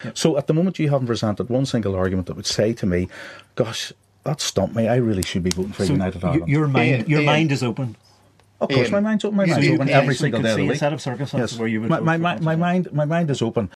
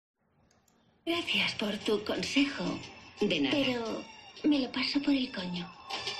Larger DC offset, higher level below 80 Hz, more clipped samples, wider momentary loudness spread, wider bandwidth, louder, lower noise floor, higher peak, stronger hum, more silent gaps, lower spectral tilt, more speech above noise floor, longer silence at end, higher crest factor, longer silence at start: neither; first, -50 dBFS vs -64 dBFS; neither; second, 8 LU vs 12 LU; about the same, 13.5 kHz vs 13 kHz; first, -21 LUFS vs -31 LUFS; second, -55 dBFS vs -69 dBFS; first, 0 dBFS vs -14 dBFS; neither; neither; first, -6 dB/octave vs -4 dB/octave; about the same, 35 dB vs 38 dB; about the same, 0.1 s vs 0 s; about the same, 20 dB vs 18 dB; second, 0 s vs 1.05 s